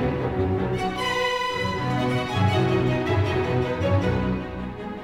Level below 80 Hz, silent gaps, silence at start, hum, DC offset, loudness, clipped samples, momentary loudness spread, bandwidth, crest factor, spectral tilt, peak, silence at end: -40 dBFS; none; 0 s; none; under 0.1%; -24 LUFS; under 0.1%; 5 LU; 14 kHz; 14 dB; -6.5 dB/octave; -10 dBFS; 0 s